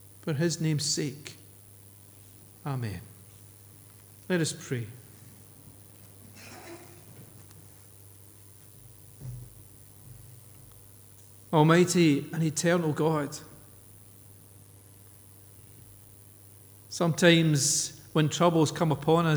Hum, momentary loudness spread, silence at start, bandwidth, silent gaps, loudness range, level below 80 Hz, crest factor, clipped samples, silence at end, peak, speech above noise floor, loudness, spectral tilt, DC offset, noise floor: none; 28 LU; 0.25 s; over 20 kHz; none; 22 LU; -64 dBFS; 24 dB; under 0.1%; 0 s; -6 dBFS; 27 dB; -26 LUFS; -5 dB/octave; under 0.1%; -53 dBFS